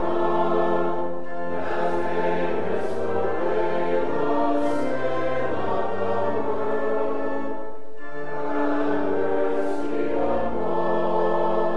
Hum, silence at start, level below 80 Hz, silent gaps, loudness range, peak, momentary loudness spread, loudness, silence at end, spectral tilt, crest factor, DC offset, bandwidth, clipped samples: none; 0 s; -54 dBFS; none; 2 LU; -10 dBFS; 7 LU; -25 LUFS; 0 s; -7.5 dB/octave; 14 dB; 7%; 11 kHz; under 0.1%